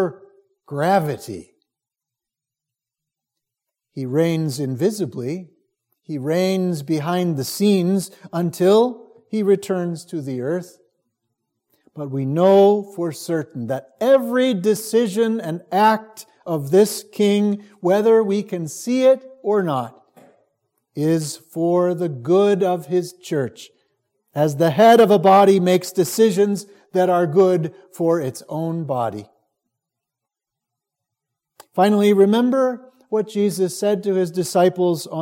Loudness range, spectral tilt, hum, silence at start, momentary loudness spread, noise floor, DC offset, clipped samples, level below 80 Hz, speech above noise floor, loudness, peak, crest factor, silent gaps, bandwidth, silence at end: 10 LU; -6 dB/octave; none; 0 s; 14 LU; -86 dBFS; under 0.1%; under 0.1%; -72 dBFS; 68 dB; -19 LUFS; -2 dBFS; 18 dB; none; 17 kHz; 0 s